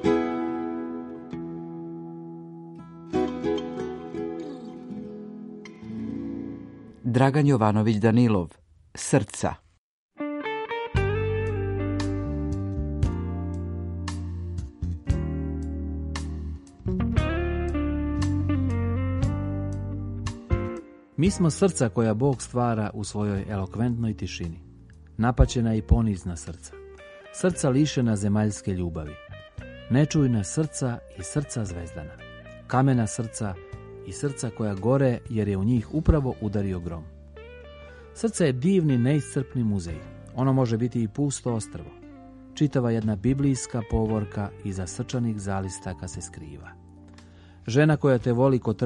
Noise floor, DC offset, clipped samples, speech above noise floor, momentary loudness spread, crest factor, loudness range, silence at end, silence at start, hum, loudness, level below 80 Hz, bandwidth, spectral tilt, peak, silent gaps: -49 dBFS; under 0.1%; under 0.1%; 24 dB; 19 LU; 22 dB; 7 LU; 0 s; 0 s; none; -26 LUFS; -38 dBFS; 11.5 kHz; -6.5 dB/octave; -4 dBFS; 9.78-10.09 s